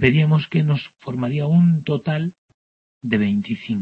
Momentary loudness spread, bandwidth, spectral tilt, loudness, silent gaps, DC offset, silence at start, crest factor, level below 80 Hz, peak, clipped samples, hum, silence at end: 10 LU; 5.2 kHz; -9 dB/octave; -20 LUFS; 2.38-2.48 s, 2.54-3.01 s; under 0.1%; 0 s; 18 dB; -52 dBFS; -2 dBFS; under 0.1%; none; 0 s